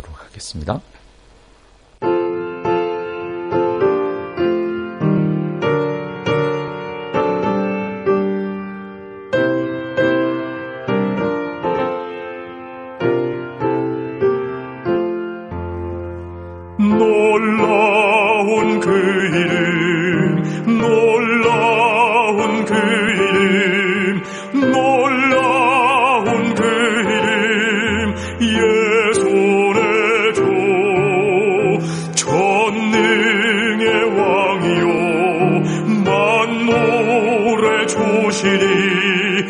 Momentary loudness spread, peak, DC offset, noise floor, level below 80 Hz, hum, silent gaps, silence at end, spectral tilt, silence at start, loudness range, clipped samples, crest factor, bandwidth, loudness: 12 LU; -2 dBFS; under 0.1%; -48 dBFS; -48 dBFS; none; none; 0 s; -5 dB/octave; 0.05 s; 7 LU; under 0.1%; 14 dB; 10.5 kHz; -16 LUFS